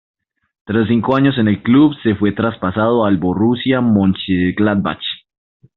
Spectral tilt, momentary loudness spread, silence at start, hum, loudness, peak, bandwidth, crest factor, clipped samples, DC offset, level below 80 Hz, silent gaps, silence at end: -5.5 dB/octave; 7 LU; 0.7 s; none; -15 LUFS; -2 dBFS; 4.4 kHz; 14 dB; under 0.1%; under 0.1%; -50 dBFS; none; 0.6 s